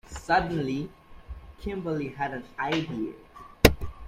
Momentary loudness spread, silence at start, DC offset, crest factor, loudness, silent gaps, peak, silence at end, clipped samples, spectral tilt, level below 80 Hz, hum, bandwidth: 22 LU; 0.1 s; under 0.1%; 28 dB; -28 LUFS; none; 0 dBFS; 0 s; under 0.1%; -5 dB/octave; -40 dBFS; none; 16.5 kHz